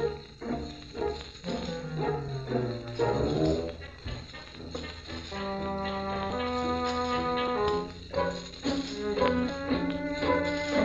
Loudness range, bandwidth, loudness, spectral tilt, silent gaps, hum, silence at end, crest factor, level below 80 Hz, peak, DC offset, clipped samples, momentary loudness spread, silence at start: 4 LU; 8.2 kHz; -32 LUFS; -6 dB/octave; none; none; 0 s; 22 dB; -46 dBFS; -10 dBFS; under 0.1%; under 0.1%; 12 LU; 0 s